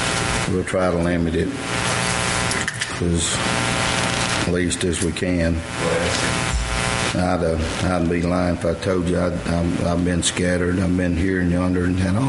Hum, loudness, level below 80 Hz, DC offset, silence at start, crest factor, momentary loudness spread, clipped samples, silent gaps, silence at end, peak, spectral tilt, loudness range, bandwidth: none; -20 LUFS; -34 dBFS; under 0.1%; 0 s; 18 dB; 3 LU; under 0.1%; none; 0 s; -4 dBFS; -4.5 dB/octave; 1 LU; 11.5 kHz